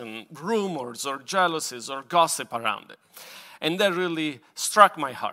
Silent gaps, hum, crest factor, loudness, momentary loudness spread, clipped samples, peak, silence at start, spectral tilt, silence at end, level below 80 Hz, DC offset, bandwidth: none; none; 26 dB; -24 LUFS; 18 LU; under 0.1%; 0 dBFS; 0 s; -3 dB/octave; 0 s; -80 dBFS; under 0.1%; 16 kHz